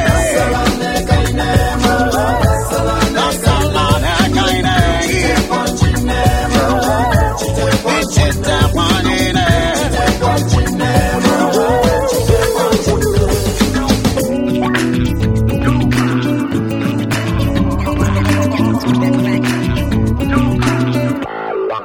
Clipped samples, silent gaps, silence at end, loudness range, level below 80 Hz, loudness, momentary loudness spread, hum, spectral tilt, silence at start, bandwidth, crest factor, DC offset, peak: under 0.1%; none; 0 s; 2 LU; -22 dBFS; -14 LUFS; 3 LU; none; -5.5 dB/octave; 0 s; 16.5 kHz; 14 dB; under 0.1%; 0 dBFS